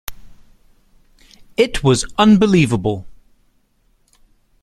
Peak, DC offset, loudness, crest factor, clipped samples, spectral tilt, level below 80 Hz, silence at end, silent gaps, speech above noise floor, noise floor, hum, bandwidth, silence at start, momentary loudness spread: 0 dBFS; under 0.1%; -15 LUFS; 18 dB; under 0.1%; -5.5 dB/octave; -40 dBFS; 1.5 s; none; 45 dB; -59 dBFS; none; 15.5 kHz; 0.1 s; 16 LU